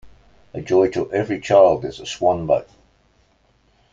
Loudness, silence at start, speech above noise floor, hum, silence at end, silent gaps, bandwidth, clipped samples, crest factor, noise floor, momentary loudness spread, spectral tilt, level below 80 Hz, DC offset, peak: -19 LUFS; 0.05 s; 42 dB; none; 1.3 s; none; 7.8 kHz; under 0.1%; 18 dB; -60 dBFS; 14 LU; -6 dB/octave; -52 dBFS; under 0.1%; -2 dBFS